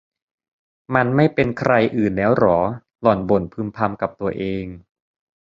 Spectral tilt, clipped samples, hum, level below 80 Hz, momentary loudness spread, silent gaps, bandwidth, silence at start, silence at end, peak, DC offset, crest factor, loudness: -9 dB/octave; under 0.1%; none; -48 dBFS; 9 LU; none; 7.6 kHz; 0.9 s; 0.65 s; 0 dBFS; under 0.1%; 20 dB; -19 LUFS